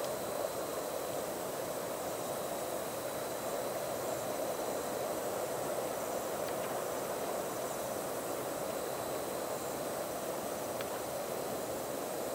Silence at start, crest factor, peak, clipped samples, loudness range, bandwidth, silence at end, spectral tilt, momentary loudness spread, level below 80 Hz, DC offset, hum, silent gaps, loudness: 0 s; 16 dB; -22 dBFS; under 0.1%; 1 LU; 16 kHz; 0 s; -3 dB/octave; 2 LU; -68 dBFS; under 0.1%; none; none; -38 LUFS